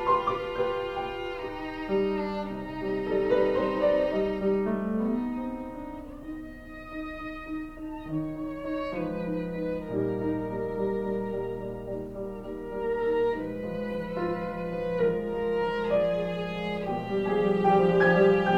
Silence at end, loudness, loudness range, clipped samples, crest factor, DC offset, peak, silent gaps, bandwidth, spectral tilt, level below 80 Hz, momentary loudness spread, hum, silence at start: 0 s; -29 LUFS; 7 LU; under 0.1%; 18 dB; under 0.1%; -10 dBFS; none; 8 kHz; -8 dB/octave; -48 dBFS; 13 LU; none; 0 s